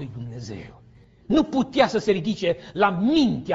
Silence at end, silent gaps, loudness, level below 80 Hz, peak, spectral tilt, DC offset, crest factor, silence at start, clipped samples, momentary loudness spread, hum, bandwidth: 0 s; none; -22 LUFS; -50 dBFS; -4 dBFS; -4.5 dB/octave; under 0.1%; 18 dB; 0 s; under 0.1%; 15 LU; none; 7.8 kHz